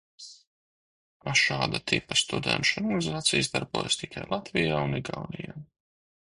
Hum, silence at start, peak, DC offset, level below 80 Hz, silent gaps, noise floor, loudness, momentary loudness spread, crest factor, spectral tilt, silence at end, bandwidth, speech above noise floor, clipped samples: none; 0.2 s; -8 dBFS; under 0.1%; -56 dBFS; 0.47-1.20 s; under -90 dBFS; -27 LUFS; 16 LU; 22 dB; -3 dB/octave; 0.7 s; 11.5 kHz; over 62 dB; under 0.1%